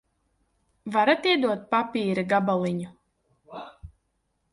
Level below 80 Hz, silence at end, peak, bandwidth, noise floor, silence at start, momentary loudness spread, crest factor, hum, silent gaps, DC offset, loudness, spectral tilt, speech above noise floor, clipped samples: -60 dBFS; 0.65 s; -8 dBFS; 11.5 kHz; -74 dBFS; 0.85 s; 21 LU; 20 dB; none; none; under 0.1%; -24 LUFS; -6 dB/octave; 50 dB; under 0.1%